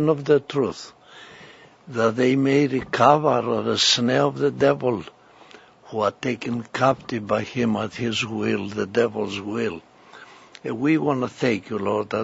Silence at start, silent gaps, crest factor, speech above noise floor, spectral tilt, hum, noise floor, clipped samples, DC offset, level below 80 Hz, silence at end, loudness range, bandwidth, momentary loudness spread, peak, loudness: 0 s; none; 22 dB; 27 dB; -5 dB/octave; none; -48 dBFS; under 0.1%; under 0.1%; -60 dBFS; 0 s; 6 LU; 8 kHz; 11 LU; -2 dBFS; -22 LUFS